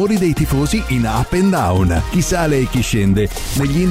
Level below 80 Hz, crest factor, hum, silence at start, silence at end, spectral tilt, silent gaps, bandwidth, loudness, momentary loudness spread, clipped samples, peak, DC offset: -26 dBFS; 10 dB; none; 0 s; 0 s; -6 dB/octave; none; 16 kHz; -16 LUFS; 3 LU; under 0.1%; -6 dBFS; under 0.1%